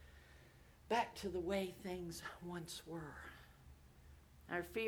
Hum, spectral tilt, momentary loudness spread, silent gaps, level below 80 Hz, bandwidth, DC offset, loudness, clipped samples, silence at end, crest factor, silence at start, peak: none; -4.5 dB/octave; 24 LU; none; -64 dBFS; over 20 kHz; under 0.1%; -45 LUFS; under 0.1%; 0 s; 22 dB; 0 s; -24 dBFS